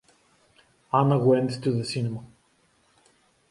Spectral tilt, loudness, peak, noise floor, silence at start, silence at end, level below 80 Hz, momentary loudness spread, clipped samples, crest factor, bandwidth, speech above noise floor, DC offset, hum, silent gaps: -7.5 dB/octave; -24 LUFS; -8 dBFS; -65 dBFS; 0.95 s; 1.25 s; -66 dBFS; 11 LU; under 0.1%; 20 dB; 11.5 kHz; 42 dB; under 0.1%; none; none